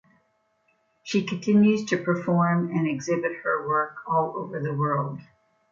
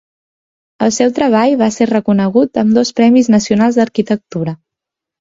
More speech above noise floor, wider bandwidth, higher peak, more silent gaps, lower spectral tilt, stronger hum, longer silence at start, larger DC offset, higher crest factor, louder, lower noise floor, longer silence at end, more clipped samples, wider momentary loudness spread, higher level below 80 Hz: second, 45 dB vs 71 dB; about the same, 7.4 kHz vs 7.8 kHz; second, -10 dBFS vs 0 dBFS; neither; first, -7 dB/octave vs -5.5 dB/octave; neither; first, 1.05 s vs 0.8 s; neither; about the same, 16 dB vs 12 dB; second, -25 LUFS vs -12 LUFS; second, -69 dBFS vs -83 dBFS; second, 0.5 s vs 0.65 s; neither; about the same, 10 LU vs 8 LU; second, -70 dBFS vs -52 dBFS